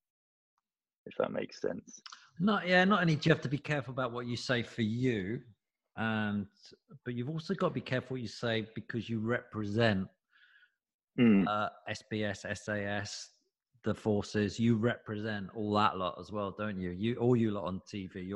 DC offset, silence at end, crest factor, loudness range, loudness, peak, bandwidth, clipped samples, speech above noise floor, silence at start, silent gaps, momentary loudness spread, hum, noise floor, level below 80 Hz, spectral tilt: under 0.1%; 0 s; 22 dB; 5 LU; -33 LUFS; -12 dBFS; 10 kHz; under 0.1%; 35 dB; 1.05 s; 10.94-10.99 s; 14 LU; none; -68 dBFS; -66 dBFS; -6.5 dB/octave